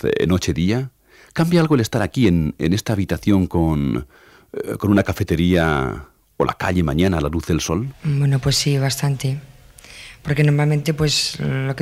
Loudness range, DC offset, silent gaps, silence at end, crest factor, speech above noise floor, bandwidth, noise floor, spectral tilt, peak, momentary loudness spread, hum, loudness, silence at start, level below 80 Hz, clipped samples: 2 LU; under 0.1%; none; 0 s; 14 dB; 24 dB; 16 kHz; -42 dBFS; -5.5 dB/octave; -4 dBFS; 10 LU; none; -19 LUFS; 0.05 s; -36 dBFS; under 0.1%